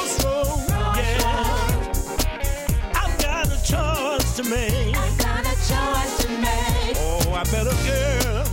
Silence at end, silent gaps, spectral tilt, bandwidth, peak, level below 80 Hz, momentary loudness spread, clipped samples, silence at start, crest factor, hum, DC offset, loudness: 0 s; none; -4 dB/octave; 16.5 kHz; -10 dBFS; -24 dBFS; 3 LU; under 0.1%; 0 s; 12 dB; none; under 0.1%; -22 LUFS